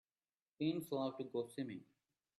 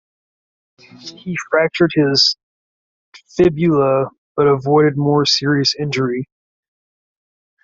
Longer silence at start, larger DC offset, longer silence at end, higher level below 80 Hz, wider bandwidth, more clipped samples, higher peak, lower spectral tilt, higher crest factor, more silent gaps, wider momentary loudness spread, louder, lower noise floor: second, 0.6 s vs 0.95 s; neither; second, 0.55 s vs 1.4 s; second, -86 dBFS vs -52 dBFS; first, 13 kHz vs 7.8 kHz; neither; second, -28 dBFS vs -2 dBFS; first, -6.5 dB/octave vs -5 dB/octave; about the same, 18 dB vs 16 dB; second, none vs 2.43-3.12 s, 4.18-4.35 s; second, 7 LU vs 15 LU; second, -43 LUFS vs -15 LUFS; about the same, under -90 dBFS vs under -90 dBFS